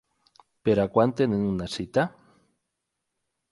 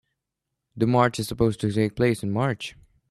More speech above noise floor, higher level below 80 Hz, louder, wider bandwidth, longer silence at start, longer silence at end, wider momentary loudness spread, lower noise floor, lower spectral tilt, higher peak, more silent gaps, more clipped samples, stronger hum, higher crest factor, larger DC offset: about the same, 58 dB vs 60 dB; about the same, -54 dBFS vs -50 dBFS; about the same, -25 LUFS vs -24 LUFS; second, 11.5 kHz vs 13.5 kHz; about the same, 0.65 s vs 0.75 s; first, 1.4 s vs 0.4 s; about the same, 8 LU vs 7 LU; about the same, -82 dBFS vs -83 dBFS; about the same, -7 dB/octave vs -6.5 dB/octave; about the same, -6 dBFS vs -6 dBFS; neither; neither; neither; about the same, 22 dB vs 18 dB; neither